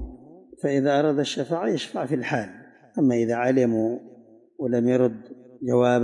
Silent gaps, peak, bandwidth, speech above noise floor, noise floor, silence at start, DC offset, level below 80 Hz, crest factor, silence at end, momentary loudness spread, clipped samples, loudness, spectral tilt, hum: none; -8 dBFS; 11.5 kHz; 26 dB; -48 dBFS; 0 s; under 0.1%; -52 dBFS; 16 dB; 0 s; 13 LU; under 0.1%; -24 LUFS; -6.5 dB/octave; none